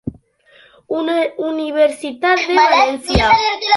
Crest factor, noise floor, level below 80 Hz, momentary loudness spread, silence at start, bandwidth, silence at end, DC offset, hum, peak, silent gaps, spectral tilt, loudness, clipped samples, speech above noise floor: 16 dB; -50 dBFS; -34 dBFS; 10 LU; 0.05 s; 11.5 kHz; 0 s; under 0.1%; none; 0 dBFS; none; -4.5 dB/octave; -15 LUFS; under 0.1%; 35 dB